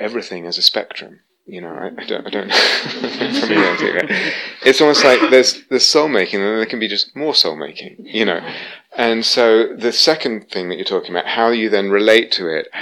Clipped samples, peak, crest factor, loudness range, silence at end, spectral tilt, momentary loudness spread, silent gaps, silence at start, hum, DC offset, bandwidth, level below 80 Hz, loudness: under 0.1%; 0 dBFS; 16 dB; 5 LU; 0 s; -2.5 dB/octave; 16 LU; none; 0 s; none; under 0.1%; 16 kHz; -66 dBFS; -15 LUFS